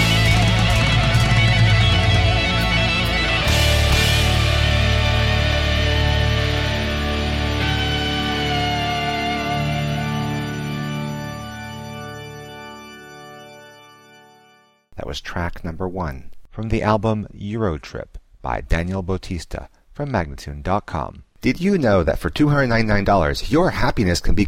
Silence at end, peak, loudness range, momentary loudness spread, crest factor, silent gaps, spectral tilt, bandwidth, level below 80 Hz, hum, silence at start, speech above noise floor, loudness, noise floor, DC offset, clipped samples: 0 s; -4 dBFS; 15 LU; 17 LU; 14 dB; none; -5 dB/octave; 16 kHz; -26 dBFS; none; 0 s; 35 dB; -19 LUFS; -55 dBFS; under 0.1%; under 0.1%